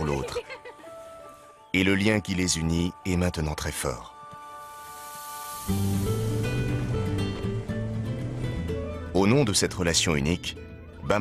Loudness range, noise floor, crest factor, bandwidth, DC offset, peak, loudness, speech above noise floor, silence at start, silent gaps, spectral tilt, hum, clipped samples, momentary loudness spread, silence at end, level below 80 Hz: 5 LU; -48 dBFS; 20 dB; 15 kHz; under 0.1%; -8 dBFS; -27 LUFS; 23 dB; 0 s; none; -4.5 dB/octave; none; under 0.1%; 19 LU; 0 s; -42 dBFS